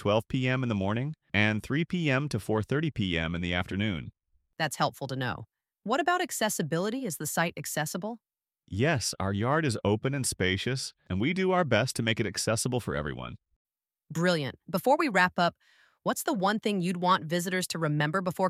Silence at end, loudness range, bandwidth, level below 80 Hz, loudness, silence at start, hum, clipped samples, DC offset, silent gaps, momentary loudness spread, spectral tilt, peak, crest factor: 0 s; 3 LU; 16 kHz; -56 dBFS; -29 LUFS; 0 s; none; under 0.1%; under 0.1%; 13.56-13.65 s; 8 LU; -4.5 dB/octave; -10 dBFS; 20 dB